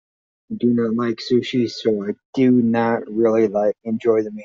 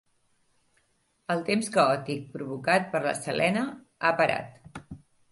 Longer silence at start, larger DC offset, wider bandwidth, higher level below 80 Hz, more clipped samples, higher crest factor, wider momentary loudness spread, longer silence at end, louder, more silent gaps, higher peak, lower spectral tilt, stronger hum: second, 0.5 s vs 1.3 s; neither; second, 7.4 kHz vs 11.5 kHz; about the same, -62 dBFS vs -64 dBFS; neither; second, 14 dB vs 20 dB; second, 6 LU vs 20 LU; second, 0 s vs 0.35 s; first, -19 LUFS vs -27 LUFS; first, 2.25-2.33 s vs none; first, -4 dBFS vs -8 dBFS; about the same, -5.5 dB/octave vs -4.5 dB/octave; neither